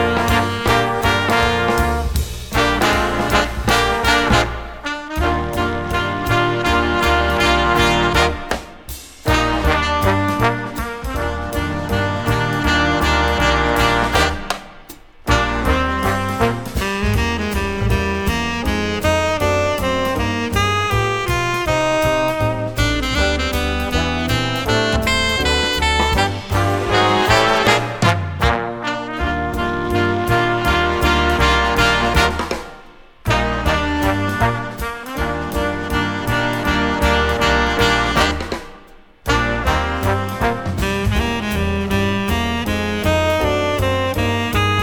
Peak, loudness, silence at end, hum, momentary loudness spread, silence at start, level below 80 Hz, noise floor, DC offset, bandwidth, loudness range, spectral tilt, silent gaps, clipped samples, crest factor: 0 dBFS; -17 LUFS; 0 s; none; 8 LU; 0 s; -28 dBFS; -43 dBFS; under 0.1%; over 20 kHz; 3 LU; -4.5 dB/octave; none; under 0.1%; 18 dB